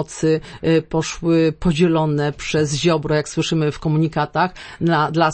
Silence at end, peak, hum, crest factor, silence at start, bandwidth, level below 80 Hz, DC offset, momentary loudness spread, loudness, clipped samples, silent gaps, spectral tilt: 0 s; -4 dBFS; none; 16 dB; 0 s; 8.8 kHz; -42 dBFS; under 0.1%; 5 LU; -19 LUFS; under 0.1%; none; -6 dB/octave